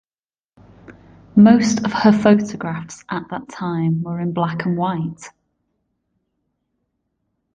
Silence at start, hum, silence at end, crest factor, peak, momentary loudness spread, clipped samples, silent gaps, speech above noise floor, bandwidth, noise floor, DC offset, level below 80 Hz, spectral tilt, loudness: 0.9 s; none; 2.25 s; 18 dB; -2 dBFS; 16 LU; under 0.1%; none; over 73 dB; 8.8 kHz; under -90 dBFS; under 0.1%; -56 dBFS; -6.5 dB/octave; -18 LUFS